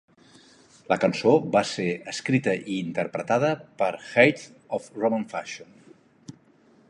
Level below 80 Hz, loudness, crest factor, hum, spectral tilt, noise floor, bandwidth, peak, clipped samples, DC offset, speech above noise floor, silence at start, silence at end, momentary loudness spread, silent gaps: -68 dBFS; -25 LUFS; 22 dB; none; -5.5 dB/octave; -58 dBFS; 11 kHz; -4 dBFS; under 0.1%; under 0.1%; 34 dB; 0.9 s; 0.6 s; 13 LU; none